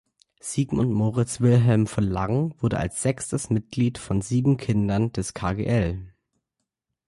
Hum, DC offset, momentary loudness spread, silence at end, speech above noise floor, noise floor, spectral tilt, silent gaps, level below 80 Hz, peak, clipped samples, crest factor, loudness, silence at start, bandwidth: none; under 0.1%; 8 LU; 1 s; 59 dB; -82 dBFS; -6.5 dB/octave; none; -44 dBFS; -8 dBFS; under 0.1%; 16 dB; -24 LUFS; 0.45 s; 11.5 kHz